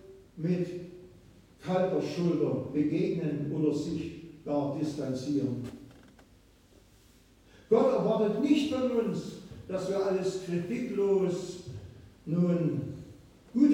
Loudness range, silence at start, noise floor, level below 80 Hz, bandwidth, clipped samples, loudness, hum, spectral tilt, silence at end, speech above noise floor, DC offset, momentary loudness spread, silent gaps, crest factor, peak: 5 LU; 0.05 s; -60 dBFS; -62 dBFS; 11.5 kHz; under 0.1%; -30 LUFS; none; -7.5 dB/octave; 0 s; 30 dB; under 0.1%; 17 LU; none; 18 dB; -12 dBFS